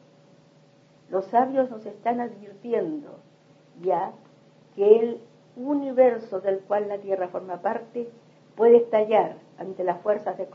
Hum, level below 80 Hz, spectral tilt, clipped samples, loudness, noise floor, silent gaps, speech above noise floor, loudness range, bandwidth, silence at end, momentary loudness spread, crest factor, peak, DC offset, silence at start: none; -82 dBFS; -8 dB/octave; under 0.1%; -24 LUFS; -56 dBFS; none; 33 dB; 5 LU; 6 kHz; 0 s; 17 LU; 22 dB; -4 dBFS; under 0.1%; 1.1 s